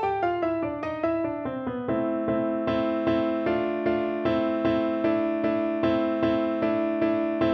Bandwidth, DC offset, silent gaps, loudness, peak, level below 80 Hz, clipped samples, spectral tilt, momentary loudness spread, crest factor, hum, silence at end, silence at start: 5.8 kHz; under 0.1%; none; -26 LUFS; -12 dBFS; -54 dBFS; under 0.1%; -8.5 dB/octave; 4 LU; 14 dB; none; 0 s; 0 s